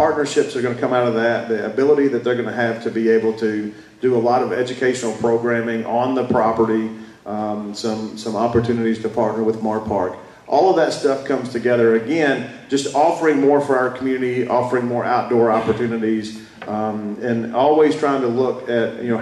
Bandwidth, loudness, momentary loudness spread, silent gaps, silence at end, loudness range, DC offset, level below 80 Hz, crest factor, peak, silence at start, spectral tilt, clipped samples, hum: 12 kHz; -19 LUFS; 9 LU; none; 0 s; 3 LU; under 0.1%; -56 dBFS; 14 dB; -4 dBFS; 0 s; -6 dB/octave; under 0.1%; none